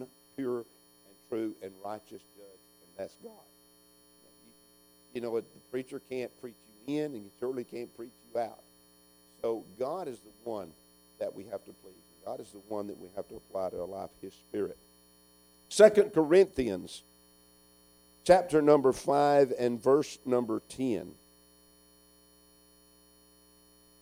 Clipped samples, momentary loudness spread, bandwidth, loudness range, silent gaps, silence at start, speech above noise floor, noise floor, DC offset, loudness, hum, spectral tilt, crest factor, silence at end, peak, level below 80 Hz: under 0.1%; 21 LU; 16.5 kHz; 17 LU; none; 0 s; 31 dB; -62 dBFS; under 0.1%; -30 LUFS; none; -5.5 dB/octave; 26 dB; 2.9 s; -6 dBFS; -66 dBFS